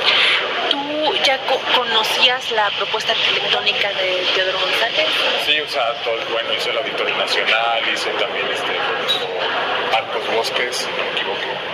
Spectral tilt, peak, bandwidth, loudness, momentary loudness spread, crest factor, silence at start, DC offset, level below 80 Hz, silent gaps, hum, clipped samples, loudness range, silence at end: -1.5 dB/octave; 0 dBFS; 15.5 kHz; -17 LUFS; 6 LU; 18 dB; 0 s; under 0.1%; -64 dBFS; none; none; under 0.1%; 3 LU; 0 s